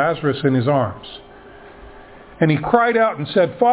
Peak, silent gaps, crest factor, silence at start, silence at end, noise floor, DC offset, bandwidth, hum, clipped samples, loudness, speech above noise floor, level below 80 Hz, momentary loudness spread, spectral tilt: 0 dBFS; none; 18 dB; 0 s; 0 s; -41 dBFS; under 0.1%; 4 kHz; none; under 0.1%; -18 LUFS; 24 dB; -50 dBFS; 15 LU; -11 dB/octave